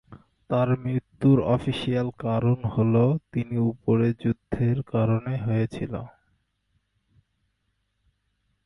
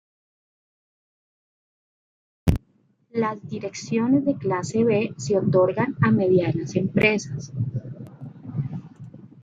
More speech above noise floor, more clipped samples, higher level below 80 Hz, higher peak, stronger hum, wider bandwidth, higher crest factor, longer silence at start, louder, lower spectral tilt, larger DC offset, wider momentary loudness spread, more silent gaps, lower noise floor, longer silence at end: first, 51 dB vs 41 dB; neither; second, -52 dBFS vs -46 dBFS; second, -10 dBFS vs -4 dBFS; neither; second, 10.5 kHz vs 15 kHz; second, 16 dB vs 22 dB; second, 0.1 s vs 2.45 s; about the same, -25 LUFS vs -23 LUFS; first, -9.5 dB/octave vs -7 dB/octave; neither; second, 8 LU vs 18 LU; neither; first, -74 dBFS vs -63 dBFS; first, 2.55 s vs 0 s